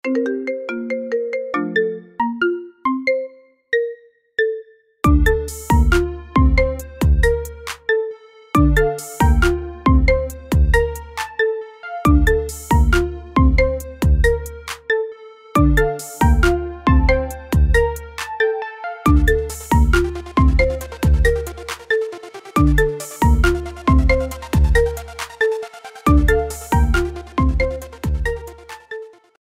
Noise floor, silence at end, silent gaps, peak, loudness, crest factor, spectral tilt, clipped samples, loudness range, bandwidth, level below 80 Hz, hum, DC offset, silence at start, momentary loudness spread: -37 dBFS; 0.4 s; none; -2 dBFS; -19 LUFS; 16 dB; -6.5 dB/octave; under 0.1%; 3 LU; 16 kHz; -20 dBFS; none; under 0.1%; 0.05 s; 12 LU